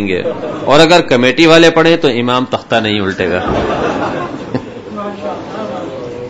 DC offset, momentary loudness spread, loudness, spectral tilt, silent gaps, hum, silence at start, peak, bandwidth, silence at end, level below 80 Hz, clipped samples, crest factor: under 0.1%; 16 LU; -11 LUFS; -5 dB/octave; none; none; 0 s; 0 dBFS; 11 kHz; 0 s; -38 dBFS; 0.6%; 12 dB